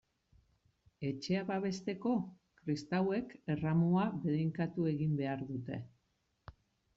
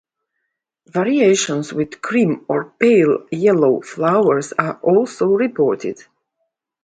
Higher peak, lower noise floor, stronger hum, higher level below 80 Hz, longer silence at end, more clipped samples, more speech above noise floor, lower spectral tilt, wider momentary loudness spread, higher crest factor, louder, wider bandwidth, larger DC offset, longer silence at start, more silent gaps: second, -22 dBFS vs 0 dBFS; first, -80 dBFS vs -76 dBFS; neither; about the same, -68 dBFS vs -64 dBFS; second, 0.45 s vs 0.9 s; neither; second, 45 dB vs 60 dB; first, -7 dB/octave vs -5.5 dB/octave; about the same, 11 LU vs 9 LU; about the same, 14 dB vs 16 dB; second, -36 LUFS vs -17 LUFS; second, 7.8 kHz vs 9.4 kHz; neither; about the same, 1 s vs 0.95 s; neither